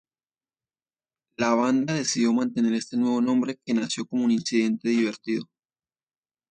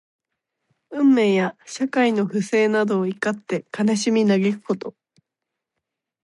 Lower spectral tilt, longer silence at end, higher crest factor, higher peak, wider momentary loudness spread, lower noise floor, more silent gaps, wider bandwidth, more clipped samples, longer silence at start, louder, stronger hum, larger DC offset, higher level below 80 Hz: about the same, -4.5 dB/octave vs -5.5 dB/octave; second, 1.05 s vs 1.35 s; about the same, 18 dB vs 16 dB; about the same, -8 dBFS vs -6 dBFS; second, 5 LU vs 10 LU; first, under -90 dBFS vs -83 dBFS; neither; second, 9.4 kHz vs 11.5 kHz; neither; first, 1.4 s vs 0.9 s; second, -25 LUFS vs -21 LUFS; neither; neither; about the same, -72 dBFS vs -72 dBFS